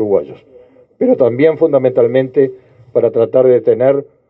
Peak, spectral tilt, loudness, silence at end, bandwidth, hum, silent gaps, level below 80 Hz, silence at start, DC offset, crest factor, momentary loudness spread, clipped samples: 0 dBFS; -11 dB/octave; -13 LUFS; 0.25 s; 4.3 kHz; none; none; -60 dBFS; 0 s; under 0.1%; 12 dB; 7 LU; under 0.1%